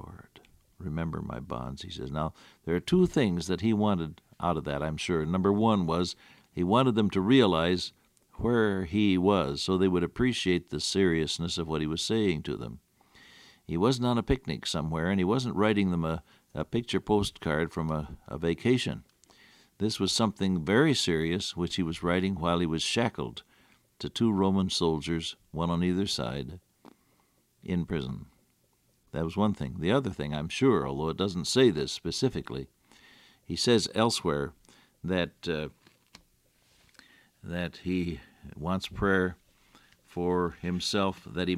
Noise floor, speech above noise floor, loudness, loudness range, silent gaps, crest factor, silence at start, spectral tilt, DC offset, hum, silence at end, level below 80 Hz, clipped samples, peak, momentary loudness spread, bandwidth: -69 dBFS; 41 dB; -29 LUFS; 7 LU; none; 20 dB; 0 s; -5.5 dB/octave; under 0.1%; none; 0 s; -52 dBFS; under 0.1%; -10 dBFS; 13 LU; 14.5 kHz